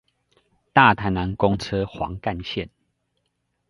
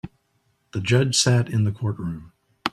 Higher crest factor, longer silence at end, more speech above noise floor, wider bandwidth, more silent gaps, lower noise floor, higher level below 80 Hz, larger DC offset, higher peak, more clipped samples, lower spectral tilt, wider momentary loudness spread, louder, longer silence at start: first, 24 dB vs 18 dB; first, 1.05 s vs 0.05 s; first, 53 dB vs 47 dB; second, 11.5 kHz vs 13 kHz; neither; first, -74 dBFS vs -68 dBFS; first, -44 dBFS vs -54 dBFS; neither; first, 0 dBFS vs -4 dBFS; neither; first, -6.5 dB/octave vs -4.5 dB/octave; about the same, 14 LU vs 16 LU; about the same, -22 LUFS vs -22 LUFS; first, 0.75 s vs 0.05 s